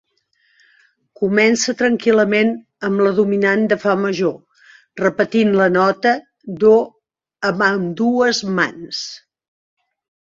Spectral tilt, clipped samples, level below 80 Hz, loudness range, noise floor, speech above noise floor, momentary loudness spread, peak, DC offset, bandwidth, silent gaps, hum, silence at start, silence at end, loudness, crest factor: -5 dB/octave; under 0.1%; -60 dBFS; 2 LU; -63 dBFS; 47 dB; 10 LU; -2 dBFS; under 0.1%; 7.8 kHz; none; none; 1.2 s; 1.2 s; -17 LUFS; 16 dB